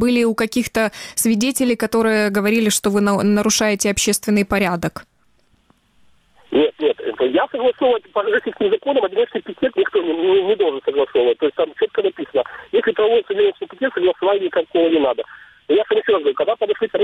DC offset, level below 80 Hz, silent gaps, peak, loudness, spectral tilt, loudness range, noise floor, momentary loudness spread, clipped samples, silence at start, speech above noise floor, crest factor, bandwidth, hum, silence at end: under 0.1%; -50 dBFS; none; -6 dBFS; -18 LUFS; -4 dB/octave; 4 LU; -60 dBFS; 5 LU; under 0.1%; 0 s; 42 dB; 12 dB; 16 kHz; none; 0 s